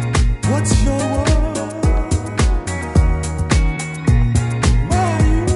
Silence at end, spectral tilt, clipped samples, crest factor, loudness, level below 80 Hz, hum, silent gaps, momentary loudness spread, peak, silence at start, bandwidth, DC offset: 0 s; -6 dB/octave; under 0.1%; 14 dB; -17 LUFS; -18 dBFS; none; none; 5 LU; -2 dBFS; 0 s; 11.5 kHz; under 0.1%